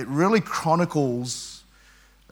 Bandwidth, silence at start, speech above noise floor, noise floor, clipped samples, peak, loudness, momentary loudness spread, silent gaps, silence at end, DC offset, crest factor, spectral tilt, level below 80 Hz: 18.5 kHz; 0 s; 32 dB; -55 dBFS; under 0.1%; -8 dBFS; -23 LUFS; 15 LU; none; 0.75 s; under 0.1%; 18 dB; -5.5 dB/octave; -58 dBFS